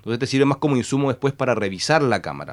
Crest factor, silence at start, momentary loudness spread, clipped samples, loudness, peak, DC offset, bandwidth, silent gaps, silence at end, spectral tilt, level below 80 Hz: 18 dB; 0.05 s; 4 LU; under 0.1%; -21 LUFS; -2 dBFS; under 0.1%; 12 kHz; none; 0 s; -5.5 dB/octave; -58 dBFS